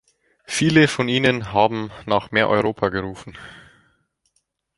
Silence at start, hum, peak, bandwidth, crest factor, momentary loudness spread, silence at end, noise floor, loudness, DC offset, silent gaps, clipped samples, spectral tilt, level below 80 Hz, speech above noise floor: 0.5 s; none; -2 dBFS; 11.5 kHz; 20 dB; 20 LU; 1.2 s; -70 dBFS; -19 LUFS; under 0.1%; none; under 0.1%; -5 dB/octave; -52 dBFS; 50 dB